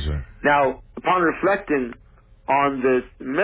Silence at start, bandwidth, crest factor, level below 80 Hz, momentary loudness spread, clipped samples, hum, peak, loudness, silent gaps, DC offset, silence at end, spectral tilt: 0 s; 4 kHz; 16 dB; -38 dBFS; 9 LU; under 0.1%; none; -6 dBFS; -21 LUFS; none; under 0.1%; 0 s; -10 dB/octave